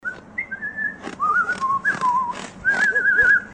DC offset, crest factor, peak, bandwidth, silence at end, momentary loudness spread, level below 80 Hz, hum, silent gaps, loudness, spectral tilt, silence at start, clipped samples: under 0.1%; 16 dB; -6 dBFS; 10 kHz; 0 s; 13 LU; -54 dBFS; none; none; -20 LUFS; -3 dB/octave; 0.05 s; under 0.1%